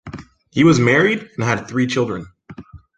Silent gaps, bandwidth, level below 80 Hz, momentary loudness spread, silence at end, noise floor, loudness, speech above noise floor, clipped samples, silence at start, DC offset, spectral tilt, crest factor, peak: none; 9.2 kHz; -48 dBFS; 22 LU; 0.2 s; -39 dBFS; -17 LUFS; 23 dB; under 0.1%; 0.05 s; under 0.1%; -6 dB/octave; 18 dB; -2 dBFS